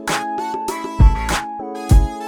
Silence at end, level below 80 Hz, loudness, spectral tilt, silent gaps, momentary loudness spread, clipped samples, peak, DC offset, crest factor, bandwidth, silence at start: 0 s; -18 dBFS; -19 LUFS; -5.5 dB/octave; none; 10 LU; under 0.1%; 0 dBFS; under 0.1%; 16 dB; 16 kHz; 0 s